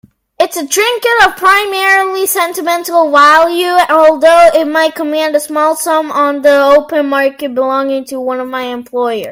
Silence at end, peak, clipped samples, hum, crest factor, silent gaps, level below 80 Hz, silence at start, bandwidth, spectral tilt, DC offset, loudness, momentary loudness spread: 0 s; 0 dBFS; 0.7%; none; 10 dB; none; -50 dBFS; 0.4 s; 16.5 kHz; -1.5 dB/octave; under 0.1%; -10 LUFS; 10 LU